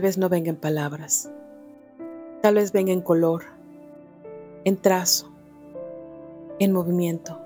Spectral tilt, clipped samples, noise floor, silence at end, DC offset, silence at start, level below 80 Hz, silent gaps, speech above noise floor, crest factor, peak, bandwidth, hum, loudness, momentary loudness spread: -4.5 dB/octave; under 0.1%; -46 dBFS; 0 s; under 0.1%; 0 s; -68 dBFS; none; 24 dB; 20 dB; -4 dBFS; 18 kHz; none; -22 LUFS; 21 LU